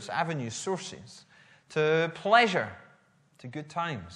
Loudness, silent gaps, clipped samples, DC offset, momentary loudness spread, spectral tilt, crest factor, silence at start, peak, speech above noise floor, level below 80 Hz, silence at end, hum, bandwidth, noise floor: -28 LUFS; none; under 0.1%; under 0.1%; 19 LU; -4.5 dB/octave; 22 dB; 0 s; -8 dBFS; 34 dB; -70 dBFS; 0 s; none; 11 kHz; -63 dBFS